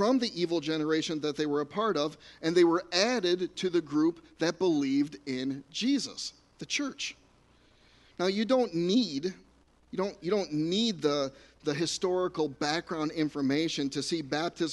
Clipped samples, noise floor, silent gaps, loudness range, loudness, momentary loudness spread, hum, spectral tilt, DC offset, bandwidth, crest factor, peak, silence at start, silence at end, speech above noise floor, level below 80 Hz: under 0.1%; -62 dBFS; none; 4 LU; -30 LUFS; 8 LU; none; -4.5 dB/octave; under 0.1%; 11.5 kHz; 18 dB; -12 dBFS; 0 s; 0 s; 33 dB; -66 dBFS